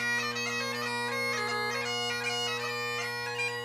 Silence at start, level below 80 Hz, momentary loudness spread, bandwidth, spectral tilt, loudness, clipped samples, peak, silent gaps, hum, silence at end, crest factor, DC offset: 0 s; -72 dBFS; 2 LU; 15.5 kHz; -2 dB/octave; -31 LUFS; under 0.1%; -20 dBFS; none; none; 0 s; 14 dB; under 0.1%